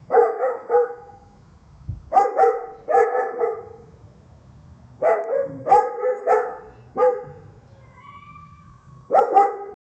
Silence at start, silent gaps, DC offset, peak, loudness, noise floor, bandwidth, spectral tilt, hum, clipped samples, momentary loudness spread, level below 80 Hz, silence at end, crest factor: 0.1 s; none; under 0.1%; -2 dBFS; -20 LUFS; -49 dBFS; 8.4 kHz; -6.5 dB/octave; none; under 0.1%; 19 LU; -54 dBFS; 0.25 s; 20 dB